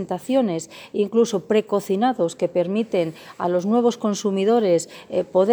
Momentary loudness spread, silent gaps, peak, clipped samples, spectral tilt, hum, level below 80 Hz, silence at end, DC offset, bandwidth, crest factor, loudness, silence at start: 8 LU; none; -6 dBFS; under 0.1%; -5.5 dB/octave; none; -68 dBFS; 0 s; under 0.1%; over 20 kHz; 14 dB; -22 LUFS; 0 s